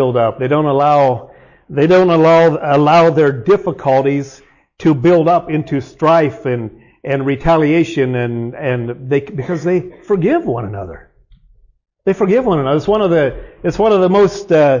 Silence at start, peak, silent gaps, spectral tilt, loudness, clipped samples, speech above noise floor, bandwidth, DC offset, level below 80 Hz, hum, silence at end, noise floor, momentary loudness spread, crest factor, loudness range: 0 s; -4 dBFS; none; -7.5 dB/octave; -14 LUFS; under 0.1%; 36 dB; 7.4 kHz; under 0.1%; -42 dBFS; none; 0 s; -49 dBFS; 12 LU; 10 dB; 6 LU